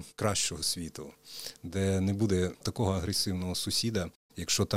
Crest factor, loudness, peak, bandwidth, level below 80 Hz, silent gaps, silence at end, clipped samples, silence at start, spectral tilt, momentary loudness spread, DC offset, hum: 18 dB; -31 LUFS; -12 dBFS; 16 kHz; -54 dBFS; 4.16-4.29 s; 0 s; under 0.1%; 0 s; -4 dB/octave; 12 LU; under 0.1%; none